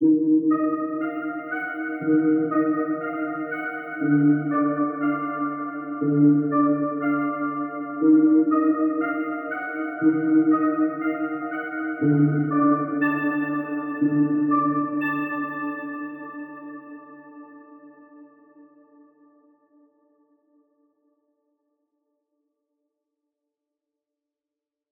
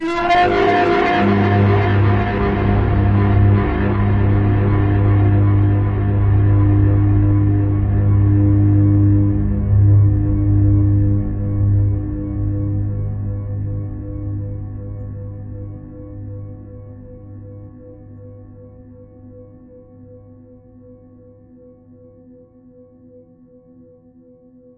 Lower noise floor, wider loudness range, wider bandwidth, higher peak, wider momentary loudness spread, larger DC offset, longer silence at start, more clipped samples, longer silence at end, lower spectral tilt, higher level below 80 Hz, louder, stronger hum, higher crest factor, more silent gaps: first, -88 dBFS vs -47 dBFS; second, 9 LU vs 18 LU; second, 3.7 kHz vs 5 kHz; second, -8 dBFS vs -4 dBFS; second, 11 LU vs 18 LU; neither; about the same, 0 s vs 0 s; neither; first, 6.65 s vs 3.85 s; first, -12.5 dB/octave vs -9.5 dB/octave; second, -84 dBFS vs -28 dBFS; second, -23 LUFS vs -16 LUFS; neither; about the same, 16 dB vs 14 dB; neither